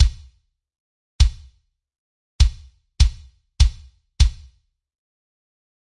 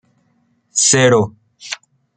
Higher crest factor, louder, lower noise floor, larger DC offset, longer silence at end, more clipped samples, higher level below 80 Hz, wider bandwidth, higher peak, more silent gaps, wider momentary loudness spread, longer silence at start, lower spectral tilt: about the same, 20 dB vs 16 dB; second, -21 LUFS vs -13 LUFS; about the same, -58 dBFS vs -61 dBFS; neither; first, 1.65 s vs 0.4 s; neither; first, -24 dBFS vs -58 dBFS; first, 11 kHz vs 9.6 kHz; about the same, -2 dBFS vs -2 dBFS; first, 0.80-1.19 s, 1.99-2.39 s vs none; second, 0 LU vs 18 LU; second, 0 s vs 0.75 s; about the same, -3.5 dB/octave vs -3 dB/octave